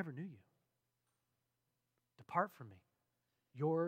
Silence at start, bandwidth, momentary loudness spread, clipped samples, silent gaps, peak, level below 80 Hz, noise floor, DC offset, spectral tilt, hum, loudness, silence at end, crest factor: 0 s; 16 kHz; 19 LU; under 0.1%; none; -20 dBFS; under -90 dBFS; -87 dBFS; under 0.1%; -9 dB/octave; none; -42 LUFS; 0 s; 24 dB